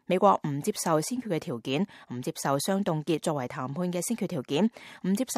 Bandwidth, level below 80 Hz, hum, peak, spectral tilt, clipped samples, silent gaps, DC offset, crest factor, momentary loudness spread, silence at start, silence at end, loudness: 15.5 kHz; -72 dBFS; none; -8 dBFS; -5 dB/octave; under 0.1%; none; under 0.1%; 20 dB; 7 LU; 0.1 s; 0 s; -29 LUFS